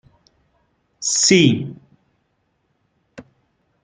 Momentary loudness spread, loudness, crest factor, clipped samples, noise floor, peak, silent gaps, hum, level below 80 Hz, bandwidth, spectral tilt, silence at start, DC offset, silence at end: 14 LU; -15 LUFS; 20 dB; under 0.1%; -68 dBFS; -2 dBFS; none; none; -60 dBFS; 10 kHz; -3.5 dB/octave; 1 s; under 0.1%; 0.6 s